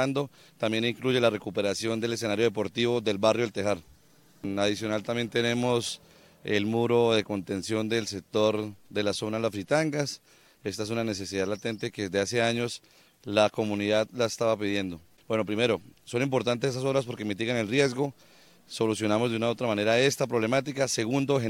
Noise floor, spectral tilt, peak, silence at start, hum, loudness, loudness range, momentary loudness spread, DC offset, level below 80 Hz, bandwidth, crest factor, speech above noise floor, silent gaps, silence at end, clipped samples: -56 dBFS; -4.5 dB/octave; -8 dBFS; 0 s; none; -28 LUFS; 3 LU; 9 LU; under 0.1%; -64 dBFS; 16.5 kHz; 20 dB; 29 dB; none; 0 s; under 0.1%